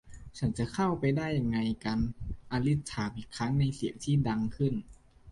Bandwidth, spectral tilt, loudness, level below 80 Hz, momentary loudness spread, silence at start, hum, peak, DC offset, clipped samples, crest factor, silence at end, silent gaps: 11.5 kHz; -7 dB/octave; -32 LUFS; -48 dBFS; 7 LU; 0.05 s; none; -16 dBFS; under 0.1%; under 0.1%; 14 dB; 0 s; none